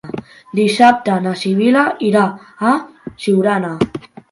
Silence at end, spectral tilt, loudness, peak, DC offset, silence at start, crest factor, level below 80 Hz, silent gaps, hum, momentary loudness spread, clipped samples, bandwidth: 0.3 s; -6 dB/octave; -15 LUFS; 0 dBFS; under 0.1%; 0.05 s; 16 dB; -54 dBFS; none; none; 13 LU; under 0.1%; 11.5 kHz